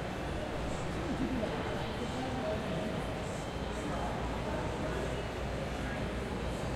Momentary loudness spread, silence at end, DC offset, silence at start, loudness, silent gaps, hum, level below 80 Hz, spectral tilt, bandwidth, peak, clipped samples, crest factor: 3 LU; 0 s; under 0.1%; 0 s; -37 LUFS; none; none; -44 dBFS; -6 dB/octave; 15.5 kHz; -22 dBFS; under 0.1%; 14 dB